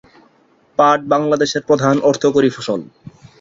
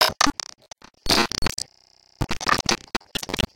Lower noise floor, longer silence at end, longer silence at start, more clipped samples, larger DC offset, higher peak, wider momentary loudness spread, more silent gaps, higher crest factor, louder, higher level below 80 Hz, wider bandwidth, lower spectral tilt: about the same, -54 dBFS vs -57 dBFS; first, 0.3 s vs 0 s; first, 0.8 s vs 0 s; neither; neither; about the same, -2 dBFS vs -2 dBFS; second, 10 LU vs 15 LU; neither; second, 16 dB vs 22 dB; first, -15 LUFS vs -23 LUFS; second, -56 dBFS vs -38 dBFS; second, 7.8 kHz vs 17 kHz; first, -5.5 dB/octave vs -2.5 dB/octave